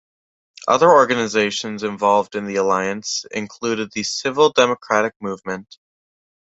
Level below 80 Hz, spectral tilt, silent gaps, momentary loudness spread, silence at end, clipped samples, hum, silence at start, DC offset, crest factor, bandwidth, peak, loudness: -62 dBFS; -3.5 dB/octave; 5.16-5.20 s; 14 LU; 0.9 s; under 0.1%; none; 0.65 s; under 0.1%; 18 dB; 8 kHz; -2 dBFS; -19 LUFS